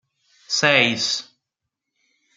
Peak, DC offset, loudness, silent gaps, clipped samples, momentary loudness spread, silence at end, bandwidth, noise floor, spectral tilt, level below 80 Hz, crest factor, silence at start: -2 dBFS; under 0.1%; -18 LUFS; none; under 0.1%; 9 LU; 1.15 s; 12 kHz; -82 dBFS; -2 dB/octave; -68 dBFS; 22 dB; 0.5 s